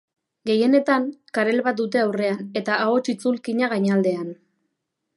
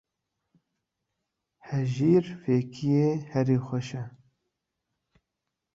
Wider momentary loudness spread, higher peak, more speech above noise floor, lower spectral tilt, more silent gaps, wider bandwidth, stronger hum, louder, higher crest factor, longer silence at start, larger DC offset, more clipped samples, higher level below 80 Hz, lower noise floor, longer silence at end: second, 8 LU vs 12 LU; first, -4 dBFS vs -12 dBFS; about the same, 57 dB vs 59 dB; second, -6 dB/octave vs -8.5 dB/octave; neither; first, 11.5 kHz vs 7.8 kHz; neither; first, -22 LUFS vs -27 LUFS; about the same, 18 dB vs 18 dB; second, 0.45 s vs 1.65 s; neither; neither; second, -74 dBFS vs -64 dBFS; second, -78 dBFS vs -85 dBFS; second, 0.85 s vs 1.65 s